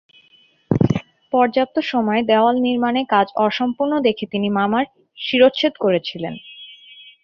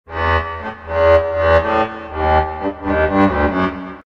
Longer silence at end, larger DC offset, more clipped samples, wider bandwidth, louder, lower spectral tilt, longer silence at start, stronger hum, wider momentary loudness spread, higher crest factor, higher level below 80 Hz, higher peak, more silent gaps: first, 0.5 s vs 0.05 s; neither; neither; about the same, 6.8 kHz vs 6.8 kHz; second, -19 LUFS vs -16 LUFS; about the same, -7.5 dB/octave vs -8 dB/octave; first, 0.7 s vs 0.1 s; neither; first, 13 LU vs 9 LU; about the same, 18 dB vs 16 dB; second, -54 dBFS vs -30 dBFS; about the same, -2 dBFS vs 0 dBFS; neither